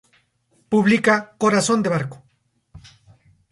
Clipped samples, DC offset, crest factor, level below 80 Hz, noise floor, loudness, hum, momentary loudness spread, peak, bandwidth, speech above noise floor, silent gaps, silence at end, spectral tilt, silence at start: under 0.1%; under 0.1%; 16 dB; -58 dBFS; -64 dBFS; -19 LUFS; none; 8 LU; -6 dBFS; 11.5 kHz; 46 dB; none; 0.7 s; -5 dB/octave; 0.7 s